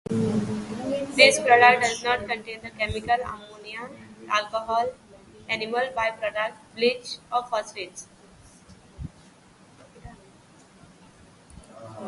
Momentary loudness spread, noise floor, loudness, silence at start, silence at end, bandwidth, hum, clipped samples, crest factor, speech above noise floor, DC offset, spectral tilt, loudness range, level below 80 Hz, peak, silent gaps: 25 LU; -54 dBFS; -23 LUFS; 0.1 s; 0 s; 11.5 kHz; none; under 0.1%; 26 dB; 30 dB; under 0.1%; -3.5 dB/octave; 14 LU; -54 dBFS; 0 dBFS; none